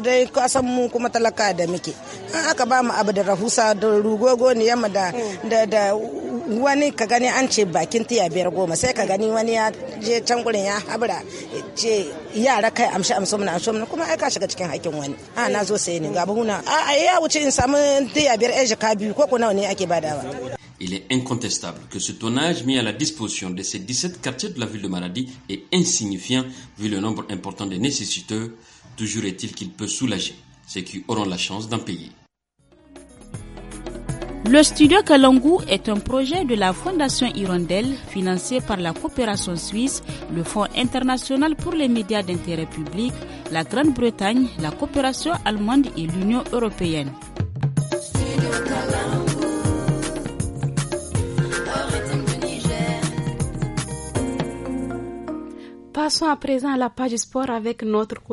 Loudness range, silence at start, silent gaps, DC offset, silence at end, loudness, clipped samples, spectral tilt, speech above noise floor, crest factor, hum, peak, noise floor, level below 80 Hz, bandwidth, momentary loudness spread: 8 LU; 0 s; none; under 0.1%; 0 s; -21 LUFS; under 0.1%; -4 dB/octave; 40 dB; 22 dB; none; 0 dBFS; -61 dBFS; -44 dBFS; 11.5 kHz; 11 LU